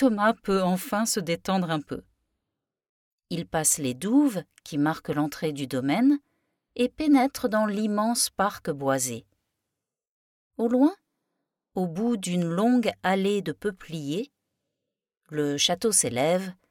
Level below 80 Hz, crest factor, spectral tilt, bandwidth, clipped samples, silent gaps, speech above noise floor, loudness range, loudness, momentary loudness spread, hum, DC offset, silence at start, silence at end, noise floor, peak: -62 dBFS; 18 dB; -4 dB/octave; 18 kHz; under 0.1%; 2.89-3.18 s, 10.09-10.51 s; 61 dB; 4 LU; -25 LUFS; 11 LU; none; under 0.1%; 0 s; 0.2 s; -86 dBFS; -8 dBFS